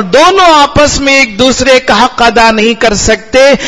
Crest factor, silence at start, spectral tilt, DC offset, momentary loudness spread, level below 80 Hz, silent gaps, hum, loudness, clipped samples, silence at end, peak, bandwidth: 6 dB; 0 s; -3 dB/octave; under 0.1%; 4 LU; -26 dBFS; none; none; -5 LUFS; 5%; 0 s; 0 dBFS; 12 kHz